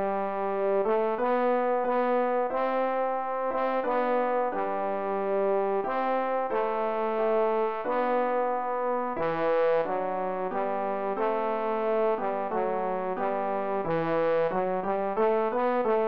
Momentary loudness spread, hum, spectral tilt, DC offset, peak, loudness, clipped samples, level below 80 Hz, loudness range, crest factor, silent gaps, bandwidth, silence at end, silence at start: 4 LU; none; -8.5 dB/octave; 0.7%; -16 dBFS; -27 LUFS; under 0.1%; -66 dBFS; 2 LU; 12 dB; none; 5.2 kHz; 0 s; 0 s